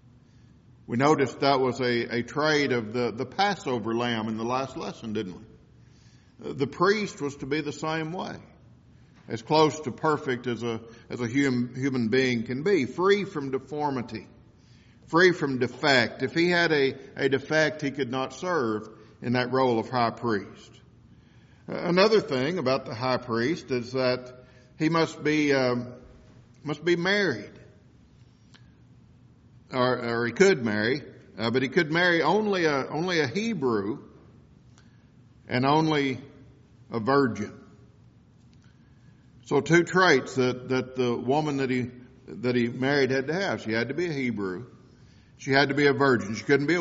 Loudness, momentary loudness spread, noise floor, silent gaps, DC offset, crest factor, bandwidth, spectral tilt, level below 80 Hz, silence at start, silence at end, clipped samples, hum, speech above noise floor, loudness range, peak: -26 LUFS; 13 LU; -55 dBFS; none; under 0.1%; 22 dB; 7.6 kHz; -4 dB/octave; -62 dBFS; 0.9 s; 0 s; under 0.1%; none; 30 dB; 6 LU; -6 dBFS